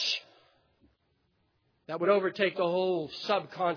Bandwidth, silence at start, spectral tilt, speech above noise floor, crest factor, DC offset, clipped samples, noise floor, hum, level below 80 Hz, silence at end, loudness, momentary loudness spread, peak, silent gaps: 5.4 kHz; 0 s; -4.5 dB/octave; 45 dB; 18 dB; under 0.1%; under 0.1%; -74 dBFS; none; -80 dBFS; 0 s; -30 LUFS; 7 LU; -14 dBFS; none